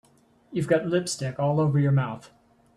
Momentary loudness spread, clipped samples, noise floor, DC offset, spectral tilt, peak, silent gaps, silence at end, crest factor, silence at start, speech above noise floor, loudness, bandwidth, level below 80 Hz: 11 LU; under 0.1%; -58 dBFS; under 0.1%; -6.5 dB/octave; -10 dBFS; none; 0.5 s; 16 dB; 0.5 s; 34 dB; -25 LUFS; 12 kHz; -62 dBFS